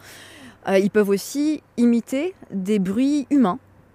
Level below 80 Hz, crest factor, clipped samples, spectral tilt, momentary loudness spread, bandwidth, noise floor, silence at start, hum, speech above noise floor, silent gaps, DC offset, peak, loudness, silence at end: -62 dBFS; 16 dB; under 0.1%; -6 dB/octave; 13 LU; 15.5 kHz; -44 dBFS; 0.05 s; none; 24 dB; none; under 0.1%; -6 dBFS; -21 LUFS; 0.35 s